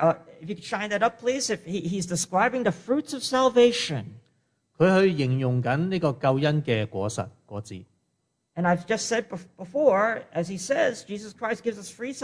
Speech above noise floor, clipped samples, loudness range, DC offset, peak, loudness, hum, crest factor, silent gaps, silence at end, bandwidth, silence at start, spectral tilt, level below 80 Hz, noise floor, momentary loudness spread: 50 dB; under 0.1%; 4 LU; under 0.1%; -8 dBFS; -25 LUFS; none; 18 dB; none; 0 s; 11 kHz; 0 s; -5 dB/octave; -64 dBFS; -75 dBFS; 15 LU